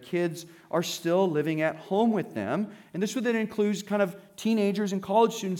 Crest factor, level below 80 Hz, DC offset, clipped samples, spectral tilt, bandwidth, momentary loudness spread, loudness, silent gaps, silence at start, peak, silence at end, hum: 16 dB; -76 dBFS; under 0.1%; under 0.1%; -5.5 dB/octave; 17.5 kHz; 7 LU; -28 LUFS; none; 0 s; -10 dBFS; 0 s; none